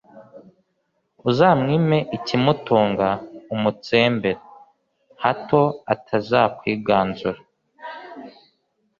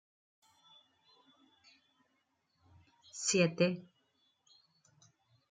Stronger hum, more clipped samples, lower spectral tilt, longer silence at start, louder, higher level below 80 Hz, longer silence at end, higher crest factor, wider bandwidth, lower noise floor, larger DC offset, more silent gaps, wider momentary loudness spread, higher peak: neither; neither; first, -7.5 dB/octave vs -4 dB/octave; second, 0.15 s vs 3.15 s; first, -20 LUFS vs -33 LUFS; first, -56 dBFS vs -82 dBFS; second, 0.7 s vs 1.7 s; about the same, 20 dB vs 24 dB; second, 7.2 kHz vs 9.6 kHz; second, -71 dBFS vs -79 dBFS; neither; neither; about the same, 18 LU vs 16 LU; first, -2 dBFS vs -16 dBFS